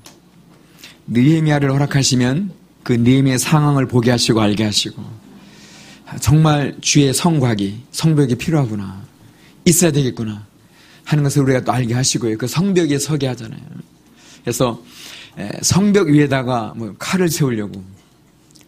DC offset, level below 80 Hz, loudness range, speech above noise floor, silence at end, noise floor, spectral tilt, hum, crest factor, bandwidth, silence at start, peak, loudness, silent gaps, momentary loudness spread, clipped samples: under 0.1%; -46 dBFS; 4 LU; 35 dB; 0.7 s; -51 dBFS; -5 dB/octave; none; 18 dB; 15.5 kHz; 0.05 s; 0 dBFS; -16 LUFS; none; 18 LU; under 0.1%